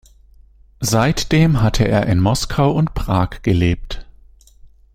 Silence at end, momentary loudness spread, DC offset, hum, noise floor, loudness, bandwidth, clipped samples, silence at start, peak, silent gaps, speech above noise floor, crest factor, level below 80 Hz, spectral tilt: 0.9 s; 8 LU; under 0.1%; none; -47 dBFS; -17 LUFS; 16 kHz; under 0.1%; 0.8 s; -2 dBFS; none; 31 dB; 16 dB; -30 dBFS; -6 dB/octave